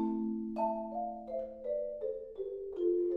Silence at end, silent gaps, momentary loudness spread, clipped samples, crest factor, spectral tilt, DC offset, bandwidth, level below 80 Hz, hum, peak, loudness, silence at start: 0 s; none; 7 LU; under 0.1%; 14 dB; -10 dB/octave; under 0.1%; 4.8 kHz; -64 dBFS; none; -22 dBFS; -37 LUFS; 0 s